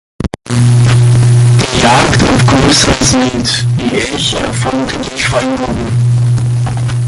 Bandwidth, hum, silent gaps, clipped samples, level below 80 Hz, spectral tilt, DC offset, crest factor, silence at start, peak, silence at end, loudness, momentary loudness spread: 11.5 kHz; none; none; under 0.1%; -28 dBFS; -5 dB/octave; under 0.1%; 10 dB; 0.2 s; 0 dBFS; 0 s; -10 LUFS; 7 LU